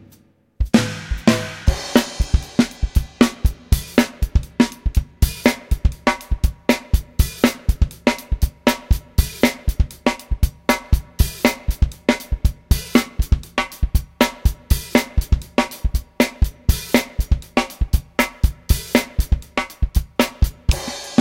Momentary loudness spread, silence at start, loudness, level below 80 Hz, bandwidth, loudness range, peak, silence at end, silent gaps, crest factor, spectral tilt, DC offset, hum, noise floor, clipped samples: 5 LU; 0.6 s; -20 LUFS; -22 dBFS; 17 kHz; 1 LU; 0 dBFS; 0 s; none; 18 dB; -5.5 dB/octave; under 0.1%; none; -53 dBFS; under 0.1%